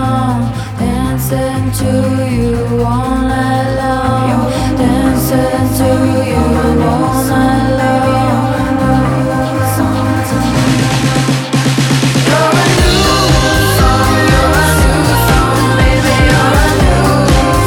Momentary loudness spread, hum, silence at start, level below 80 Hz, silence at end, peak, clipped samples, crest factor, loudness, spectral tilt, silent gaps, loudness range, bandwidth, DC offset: 5 LU; none; 0 s; -20 dBFS; 0 s; 0 dBFS; under 0.1%; 10 dB; -11 LUFS; -5.5 dB/octave; none; 4 LU; 18.5 kHz; under 0.1%